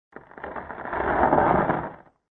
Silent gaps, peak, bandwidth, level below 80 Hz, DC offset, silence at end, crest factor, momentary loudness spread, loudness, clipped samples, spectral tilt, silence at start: none; -4 dBFS; 4.3 kHz; -44 dBFS; under 0.1%; 0.3 s; 20 dB; 17 LU; -23 LUFS; under 0.1%; -10.5 dB/octave; 0.15 s